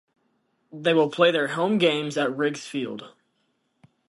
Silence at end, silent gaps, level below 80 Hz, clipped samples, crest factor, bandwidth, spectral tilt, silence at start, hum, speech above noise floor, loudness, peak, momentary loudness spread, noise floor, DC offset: 1 s; none; -74 dBFS; under 0.1%; 20 dB; 11.5 kHz; -5 dB/octave; 0.75 s; none; 49 dB; -23 LUFS; -6 dBFS; 11 LU; -72 dBFS; under 0.1%